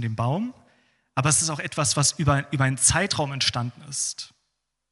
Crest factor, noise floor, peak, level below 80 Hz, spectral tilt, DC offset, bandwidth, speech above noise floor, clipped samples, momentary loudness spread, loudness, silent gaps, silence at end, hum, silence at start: 20 dB; -78 dBFS; -4 dBFS; -50 dBFS; -3 dB/octave; under 0.1%; 12 kHz; 54 dB; under 0.1%; 12 LU; -23 LUFS; none; 0.65 s; none; 0 s